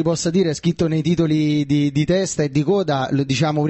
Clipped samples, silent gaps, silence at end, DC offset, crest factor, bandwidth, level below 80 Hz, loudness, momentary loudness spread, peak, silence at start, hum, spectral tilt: under 0.1%; none; 0 s; under 0.1%; 12 dB; 8.6 kHz; -48 dBFS; -19 LUFS; 2 LU; -6 dBFS; 0 s; none; -6 dB/octave